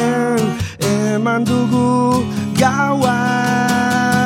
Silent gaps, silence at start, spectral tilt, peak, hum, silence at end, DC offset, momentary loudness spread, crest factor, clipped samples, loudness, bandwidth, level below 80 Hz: none; 0 s; -5.5 dB/octave; 0 dBFS; none; 0 s; under 0.1%; 4 LU; 14 dB; under 0.1%; -16 LUFS; 16.5 kHz; -50 dBFS